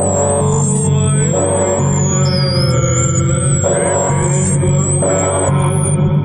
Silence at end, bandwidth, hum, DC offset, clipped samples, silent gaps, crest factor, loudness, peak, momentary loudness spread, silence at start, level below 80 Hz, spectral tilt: 0 s; 11 kHz; none; under 0.1%; under 0.1%; none; 10 dB; -13 LUFS; -2 dBFS; 1 LU; 0 s; -36 dBFS; -5 dB/octave